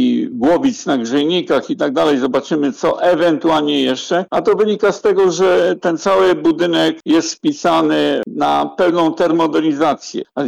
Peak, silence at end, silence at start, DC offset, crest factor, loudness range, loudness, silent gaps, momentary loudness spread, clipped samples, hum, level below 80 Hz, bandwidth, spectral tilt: -6 dBFS; 0 s; 0 s; under 0.1%; 8 dB; 1 LU; -15 LUFS; none; 4 LU; under 0.1%; none; -54 dBFS; 11 kHz; -4.5 dB/octave